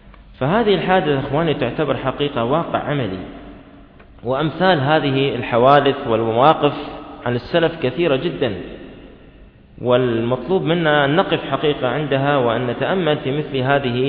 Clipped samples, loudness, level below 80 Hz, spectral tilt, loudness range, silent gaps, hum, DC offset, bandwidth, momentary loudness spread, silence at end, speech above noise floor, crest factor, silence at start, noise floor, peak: under 0.1%; -18 LUFS; -46 dBFS; -9.5 dB/octave; 5 LU; none; none; under 0.1%; 5.4 kHz; 10 LU; 0 s; 27 dB; 18 dB; 0.05 s; -44 dBFS; 0 dBFS